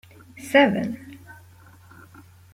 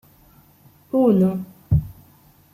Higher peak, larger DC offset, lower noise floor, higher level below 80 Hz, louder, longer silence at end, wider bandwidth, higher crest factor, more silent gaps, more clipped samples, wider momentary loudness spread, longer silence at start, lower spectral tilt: about the same, -4 dBFS vs -6 dBFS; neither; about the same, -50 dBFS vs -53 dBFS; second, -66 dBFS vs -40 dBFS; about the same, -20 LUFS vs -20 LUFS; first, 1.2 s vs 0.6 s; about the same, 16 kHz vs 15 kHz; first, 22 dB vs 16 dB; neither; neither; first, 26 LU vs 14 LU; second, 0.35 s vs 0.95 s; second, -5.5 dB/octave vs -11 dB/octave